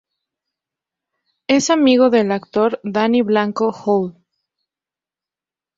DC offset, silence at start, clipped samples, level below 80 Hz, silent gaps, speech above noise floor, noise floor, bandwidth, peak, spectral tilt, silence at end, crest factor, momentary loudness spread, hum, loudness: under 0.1%; 1.5 s; under 0.1%; -64 dBFS; none; 74 dB; -90 dBFS; 7.8 kHz; -2 dBFS; -4.5 dB/octave; 1.65 s; 16 dB; 7 LU; none; -16 LUFS